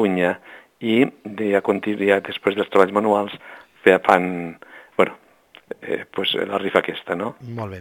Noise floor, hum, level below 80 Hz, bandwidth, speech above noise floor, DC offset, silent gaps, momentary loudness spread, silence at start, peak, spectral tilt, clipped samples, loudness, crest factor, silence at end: -51 dBFS; none; -66 dBFS; 17.5 kHz; 31 dB; under 0.1%; none; 14 LU; 0 s; 0 dBFS; -6 dB/octave; under 0.1%; -21 LUFS; 20 dB; 0 s